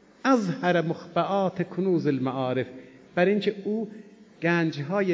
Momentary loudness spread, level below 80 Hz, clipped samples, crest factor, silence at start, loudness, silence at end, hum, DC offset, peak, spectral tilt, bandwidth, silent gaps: 8 LU; -72 dBFS; under 0.1%; 16 dB; 0.25 s; -26 LUFS; 0 s; none; under 0.1%; -10 dBFS; -7 dB/octave; 7.8 kHz; none